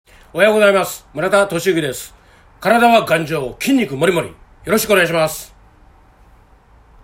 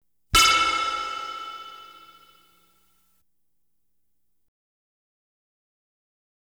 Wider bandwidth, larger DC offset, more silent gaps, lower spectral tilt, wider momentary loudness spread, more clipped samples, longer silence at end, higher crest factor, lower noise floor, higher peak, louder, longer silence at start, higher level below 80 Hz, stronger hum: second, 16.5 kHz vs over 20 kHz; neither; neither; first, -4 dB/octave vs 0 dB/octave; second, 16 LU vs 24 LU; neither; second, 1.55 s vs 4.5 s; second, 16 dB vs 24 dB; second, -48 dBFS vs -79 dBFS; first, 0 dBFS vs -4 dBFS; first, -15 LUFS vs -21 LUFS; about the same, 0.35 s vs 0.35 s; about the same, -48 dBFS vs -48 dBFS; neither